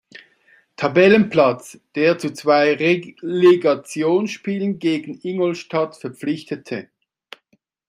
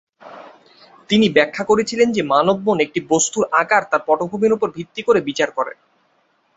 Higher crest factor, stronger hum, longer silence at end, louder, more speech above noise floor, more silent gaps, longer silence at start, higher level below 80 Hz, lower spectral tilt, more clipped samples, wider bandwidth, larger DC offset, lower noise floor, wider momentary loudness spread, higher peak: about the same, 18 dB vs 18 dB; neither; first, 1.05 s vs 0.85 s; about the same, -19 LUFS vs -17 LUFS; about the same, 46 dB vs 45 dB; neither; about the same, 0.15 s vs 0.25 s; second, -64 dBFS vs -58 dBFS; first, -6 dB/octave vs -3.5 dB/octave; neither; first, 12.5 kHz vs 8 kHz; neither; about the same, -64 dBFS vs -62 dBFS; first, 14 LU vs 6 LU; about the same, -2 dBFS vs 0 dBFS